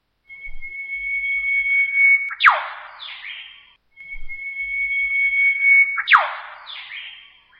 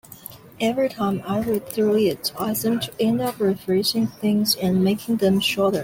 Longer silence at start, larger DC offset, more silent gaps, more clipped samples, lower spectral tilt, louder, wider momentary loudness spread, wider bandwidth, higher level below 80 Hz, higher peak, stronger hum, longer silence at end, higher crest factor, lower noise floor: first, 0.3 s vs 0.1 s; neither; neither; neither; second, -0.5 dB/octave vs -5 dB/octave; first, -16 LUFS vs -22 LUFS; first, 21 LU vs 6 LU; second, 7 kHz vs 17 kHz; first, -44 dBFS vs -56 dBFS; first, 0 dBFS vs -8 dBFS; neither; first, 0.4 s vs 0 s; first, 20 dB vs 14 dB; first, -49 dBFS vs -42 dBFS